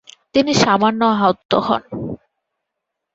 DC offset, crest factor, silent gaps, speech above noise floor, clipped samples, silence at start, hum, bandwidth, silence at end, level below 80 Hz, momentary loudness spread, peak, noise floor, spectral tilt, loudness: under 0.1%; 18 dB; 1.45-1.49 s; 64 dB; under 0.1%; 0.35 s; none; 8 kHz; 1 s; -52 dBFS; 14 LU; -2 dBFS; -79 dBFS; -4.5 dB/octave; -16 LUFS